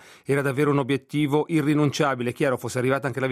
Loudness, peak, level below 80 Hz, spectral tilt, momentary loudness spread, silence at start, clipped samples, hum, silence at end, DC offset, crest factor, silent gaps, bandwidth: -23 LUFS; -8 dBFS; -62 dBFS; -6.5 dB/octave; 4 LU; 0.3 s; under 0.1%; none; 0 s; under 0.1%; 16 dB; none; 15 kHz